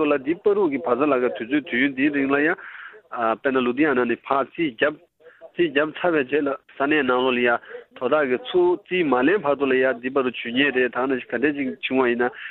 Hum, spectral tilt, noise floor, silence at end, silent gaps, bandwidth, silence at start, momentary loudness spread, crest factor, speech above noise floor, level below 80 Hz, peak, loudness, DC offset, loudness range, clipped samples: none; -8.5 dB/octave; -48 dBFS; 0 s; none; 4.2 kHz; 0 s; 7 LU; 18 dB; 26 dB; -62 dBFS; -4 dBFS; -22 LUFS; under 0.1%; 2 LU; under 0.1%